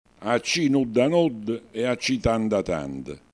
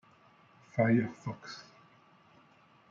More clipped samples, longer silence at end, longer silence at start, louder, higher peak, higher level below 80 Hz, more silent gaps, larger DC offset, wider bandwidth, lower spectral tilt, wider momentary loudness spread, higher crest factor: neither; second, 0.15 s vs 1.3 s; second, 0.2 s vs 0.75 s; first, -24 LUFS vs -32 LUFS; first, -8 dBFS vs -14 dBFS; first, -46 dBFS vs -76 dBFS; neither; neither; first, 11 kHz vs 7.4 kHz; second, -5 dB/octave vs -7.5 dB/octave; second, 10 LU vs 19 LU; second, 16 dB vs 22 dB